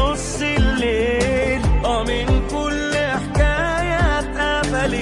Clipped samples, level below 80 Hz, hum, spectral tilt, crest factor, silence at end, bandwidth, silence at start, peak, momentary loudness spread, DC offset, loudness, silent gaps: under 0.1%; -24 dBFS; none; -5 dB/octave; 14 dB; 0 s; 11.5 kHz; 0 s; -4 dBFS; 2 LU; under 0.1%; -19 LUFS; none